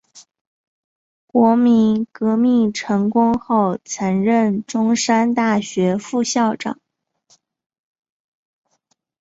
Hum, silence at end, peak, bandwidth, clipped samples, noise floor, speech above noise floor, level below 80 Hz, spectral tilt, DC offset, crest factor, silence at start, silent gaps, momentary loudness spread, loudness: none; 2.5 s; -2 dBFS; 8 kHz; under 0.1%; -68 dBFS; 51 dB; -60 dBFS; -5.5 dB/octave; under 0.1%; 16 dB; 0.15 s; 0.41-1.28 s; 7 LU; -17 LUFS